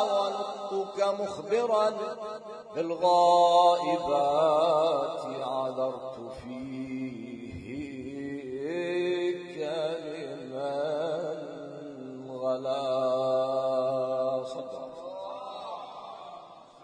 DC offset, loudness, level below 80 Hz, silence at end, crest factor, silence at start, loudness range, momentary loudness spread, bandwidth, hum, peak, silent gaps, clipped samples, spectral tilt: under 0.1%; -29 LUFS; -68 dBFS; 0 s; 18 dB; 0 s; 10 LU; 17 LU; 10 kHz; none; -10 dBFS; none; under 0.1%; -5 dB/octave